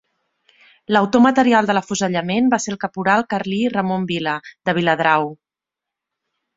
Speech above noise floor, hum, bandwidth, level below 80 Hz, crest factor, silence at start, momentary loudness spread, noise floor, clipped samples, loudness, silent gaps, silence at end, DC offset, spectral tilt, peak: 69 dB; none; 7.8 kHz; -58 dBFS; 18 dB; 0.9 s; 9 LU; -86 dBFS; under 0.1%; -18 LUFS; none; 1.2 s; under 0.1%; -5 dB/octave; -2 dBFS